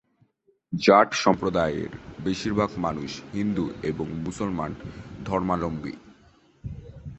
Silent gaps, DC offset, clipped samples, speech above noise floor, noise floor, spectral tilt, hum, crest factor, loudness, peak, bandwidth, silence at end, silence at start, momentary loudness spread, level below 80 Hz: none; under 0.1%; under 0.1%; 40 dB; -65 dBFS; -5.5 dB/octave; none; 24 dB; -25 LUFS; -4 dBFS; 8.4 kHz; 0 s; 0.7 s; 21 LU; -48 dBFS